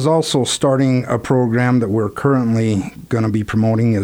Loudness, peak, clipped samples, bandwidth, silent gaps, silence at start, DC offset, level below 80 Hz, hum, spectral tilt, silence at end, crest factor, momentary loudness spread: -17 LUFS; -4 dBFS; under 0.1%; 16 kHz; none; 0 s; under 0.1%; -46 dBFS; none; -6 dB/octave; 0 s; 12 dB; 4 LU